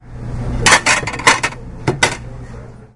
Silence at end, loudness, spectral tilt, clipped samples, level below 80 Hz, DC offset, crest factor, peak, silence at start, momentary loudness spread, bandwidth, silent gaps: 0.1 s; -14 LUFS; -2.5 dB/octave; 0.1%; -30 dBFS; under 0.1%; 18 dB; 0 dBFS; 0.05 s; 22 LU; 12 kHz; none